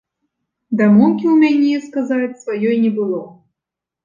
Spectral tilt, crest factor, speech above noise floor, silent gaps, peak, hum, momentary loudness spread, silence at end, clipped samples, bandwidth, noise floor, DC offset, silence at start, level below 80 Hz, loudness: -8 dB/octave; 14 dB; 70 dB; none; -2 dBFS; none; 11 LU; 0.75 s; under 0.1%; 7.4 kHz; -85 dBFS; under 0.1%; 0.7 s; -64 dBFS; -16 LUFS